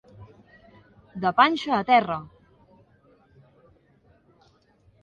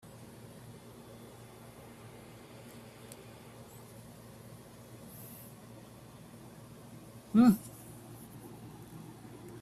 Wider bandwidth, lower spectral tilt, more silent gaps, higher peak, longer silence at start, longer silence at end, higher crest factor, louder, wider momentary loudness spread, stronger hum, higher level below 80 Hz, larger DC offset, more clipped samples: second, 7.4 kHz vs 14.5 kHz; about the same, -5.5 dB/octave vs -6.5 dB/octave; neither; first, -4 dBFS vs -14 dBFS; first, 0.2 s vs 0 s; first, 2.8 s vs 0 s; about the same, 24 dB vs 24 dB; first, -22 LUFS vs -28 LUFS; second, 13 LU vs 18 LU; neither; about the same, -64 dBFS vs -68 dBFS; neither; neither